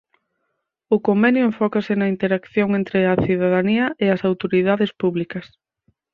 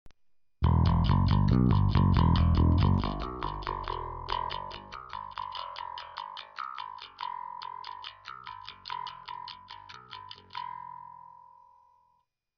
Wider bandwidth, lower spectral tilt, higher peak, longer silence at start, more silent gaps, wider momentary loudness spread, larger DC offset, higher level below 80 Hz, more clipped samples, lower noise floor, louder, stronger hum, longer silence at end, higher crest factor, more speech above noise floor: second, 5.2 kHz vs 6 kHz; about the same, -9 dB/octave vs -8.5 dB/octave; first, -4 dBFS vs -12 dBFS; first, 0.9 s vs 0.05 s; neither; second, 6 LU vs 20 LU; neither; second, -54 dBFS vs -38 dBFS; neither; about the same, -75 dBFS vs -73 dBFS; first, -19 LUFS vs -30 LUFS; neither; second, 0.7 s vs 1.35 s; about the same, 16 dB vs 18 dB; first, 56 dB vs 49 dB